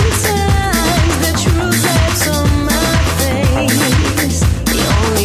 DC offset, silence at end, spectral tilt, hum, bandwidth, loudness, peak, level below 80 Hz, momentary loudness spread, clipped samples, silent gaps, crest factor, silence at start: under 0.1%; 0 s; -4.5 dB/octave; none; 16 kHz; -13 LUFS; -2 dBFS; -18 dBFS; 2 LU; under 0.1%; none; 12 dB; 0 s